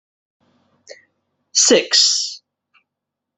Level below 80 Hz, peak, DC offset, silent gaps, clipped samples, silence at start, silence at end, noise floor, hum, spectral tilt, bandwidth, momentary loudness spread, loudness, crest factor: -68 dBFS; 0 dBFS; under 0.1%; none; under 0.1%; 0.9 s; 1 s; -82 dBFS; none; 0 dB/octave; 8.6 kHz; 14 LU; -14 LUFS; 20 dB